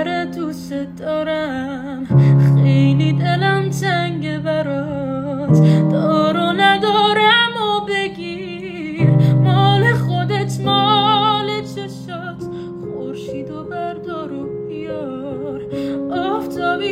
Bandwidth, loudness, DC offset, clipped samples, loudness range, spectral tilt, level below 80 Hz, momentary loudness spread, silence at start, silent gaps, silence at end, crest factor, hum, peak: 9.8 kHz; -17 LUFS; under 0.1%; under 0.1%; 12 LU; -6.5 dB/octave; -50 dBFS; 15 LU; 0 s; none; 0 s; 14 dB; none; -2 dBFS